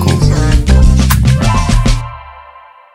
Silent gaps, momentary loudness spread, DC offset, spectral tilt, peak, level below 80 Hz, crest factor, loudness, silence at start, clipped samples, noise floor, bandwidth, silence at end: none; 9 LU; under 0.1%; -6 dB/octave; 0 dBFS; -12 dBFS; 10 dB; -11 LUFS; 0 s; under 0.1%; -38 dBFS; 16.5 kHz; 0.55 s